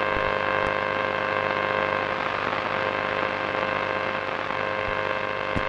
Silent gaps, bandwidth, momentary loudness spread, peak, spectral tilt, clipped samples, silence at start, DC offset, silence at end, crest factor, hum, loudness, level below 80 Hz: none; 9.6 kHz; 3 LU; -6 dBFS; -5.5 dB/octave; under 0.1%; 0 s; under 0.1%; 0 s; 20 dB; 50 Hz at -45 dBFS; -25 LUFS; -50 dBFS